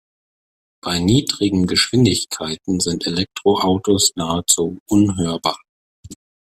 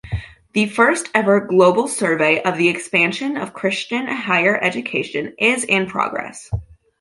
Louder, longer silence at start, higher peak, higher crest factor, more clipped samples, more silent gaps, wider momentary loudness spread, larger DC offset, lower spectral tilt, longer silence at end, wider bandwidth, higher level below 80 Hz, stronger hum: about the same, -18 LUFS vs -18 LUFS; first, 0.85 s vs 0.05 s; about the same, 0 dBFS vs -2 dBFS; about the same, 20 dB vs 18 dB; neither; first, 4.80-4.86 s, 5.69-6.03 s vs none; second, 8 LU vs 12 LU; neither; about the same, -4 dB/octave vs -4.5 dB/octave; about the same, 0.45 s vs 0.35 s; first, 15.5 kHz vs 11.5 kHz; second, -48 dBFS vs -42 dBFS; neither